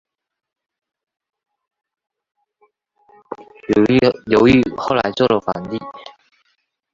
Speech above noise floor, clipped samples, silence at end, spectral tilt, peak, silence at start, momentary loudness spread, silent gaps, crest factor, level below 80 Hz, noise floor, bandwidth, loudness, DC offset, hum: 50 dB; under 0.1%; 0.85 s; -7 dB/octave; 0 dBFS; 3.3 s; 23 LU; none; 20 dB; -48 dBFS; -67 dBFS; 7.6 kHz; -16 LUFS; under 0.1%; none